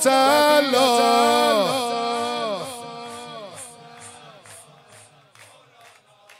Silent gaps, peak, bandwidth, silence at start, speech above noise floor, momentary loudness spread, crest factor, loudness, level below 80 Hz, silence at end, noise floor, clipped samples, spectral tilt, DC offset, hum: none; -6 dBFS; 16 kHz; 0 s; 35 dB; 23 LU; 16 dB; -18 LUFS; -76 dBFS; 1.8 s; -52 dBFS; under 0.1%; -2 dB/octave; under 0.1%; none